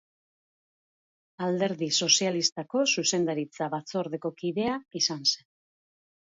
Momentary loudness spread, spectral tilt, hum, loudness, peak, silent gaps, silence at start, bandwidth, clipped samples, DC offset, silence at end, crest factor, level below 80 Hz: 11 LU; -2.5 dB/octave; none; -27 LUFS; -6 dBFS; 2.52-2.56 s; 1.4 s; 7.8 kHz; under 0.1%; under 0.1%; 1 s; 24 dB; -74 dBFS